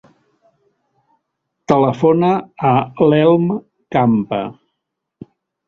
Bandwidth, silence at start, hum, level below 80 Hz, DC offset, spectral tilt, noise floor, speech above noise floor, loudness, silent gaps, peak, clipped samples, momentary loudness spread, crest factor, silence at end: 7.2 kHz; 1.7 s; none; -54 dBFS; under 0.1%; -8.5 dB/octave; -77 dBFS; 63 dB; -15 LUFS; none; 0 dBFS; under 0.1%; 11 LU; 16 dB; 1.15 s